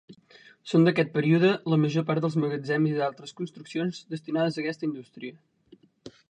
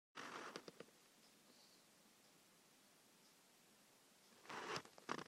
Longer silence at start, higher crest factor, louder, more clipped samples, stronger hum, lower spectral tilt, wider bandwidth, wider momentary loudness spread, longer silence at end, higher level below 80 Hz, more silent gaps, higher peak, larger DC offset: about the same, 0.1 s vs 0.15 s; second, 18 dB vs 32 dB; first, -26 LUFS vs -54 LUFS; neither; neither; first, -7.5 dB/octave vs -2.5 dB/octave; second, 9.2 kHz vs 16 kHz; second, 16 LU vs 19 LU; first, 0.2 s vs 0 s; first, -72 dBFS vs under -90 dBFS; neither; first, -8 dBFS vs -26 dBFS; neither